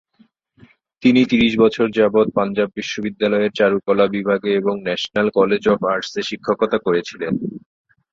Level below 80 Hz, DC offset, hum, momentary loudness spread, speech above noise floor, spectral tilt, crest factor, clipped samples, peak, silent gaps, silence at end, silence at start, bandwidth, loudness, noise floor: -54 dBFS; under 0.1%; none; 9 LU; 39 dB; -6 dB/octave; 16 dB; under 0.1%; -2 dBFS; none; 0.55 s; 1 s; 7.6 kHz; -18 LUFS; -57 dBFS